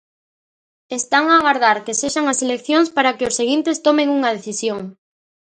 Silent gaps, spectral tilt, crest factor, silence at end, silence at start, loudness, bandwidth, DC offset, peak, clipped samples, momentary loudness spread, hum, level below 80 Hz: none; -2 dB/octave; 18 dB; 0.65 s; 0.9 s; -17 LUFS; 10 kHz; under 0.1%; 0 dBFS; under 0.1%; 10 LU; none; -60 dBFS